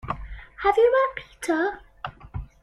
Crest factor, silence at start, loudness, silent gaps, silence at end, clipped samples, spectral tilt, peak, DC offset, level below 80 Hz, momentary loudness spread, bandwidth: 18 dB; 0.05 s; -23 LUFS; none; 0.2 s; under 0.1%; -5.5 dB/octave; -6 dBFS; under 0.1%; -44 dBFS; 20 LU; 13 kHz